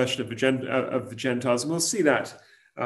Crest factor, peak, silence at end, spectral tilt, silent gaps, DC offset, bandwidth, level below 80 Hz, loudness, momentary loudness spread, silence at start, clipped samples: 20 dB; -6 dBFS; 0 s; -4 dB/octave; none; under 0.1%; 13 kHz; -68 dBFS; -25 LUFS; 6 LU; 0 s; under 0.1%